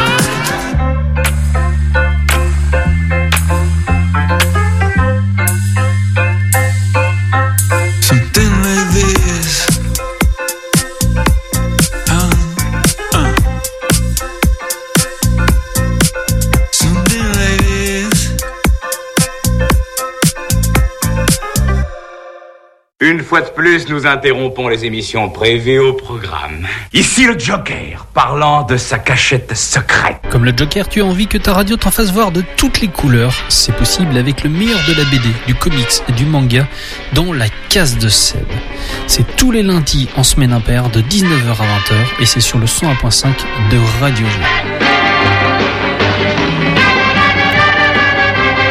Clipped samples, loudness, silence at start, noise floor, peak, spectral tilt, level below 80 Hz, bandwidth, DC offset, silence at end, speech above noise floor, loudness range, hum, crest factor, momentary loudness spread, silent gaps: under 0.1%; -12 LUFS; 0 s; -44 dBFS; 0 dBFS; -4 dB/octave; -20 dBFS; 16.5 kHz; under 0.1%; 0 s; 32 dB; 3 LU; none; 12 dB; 6 LU; none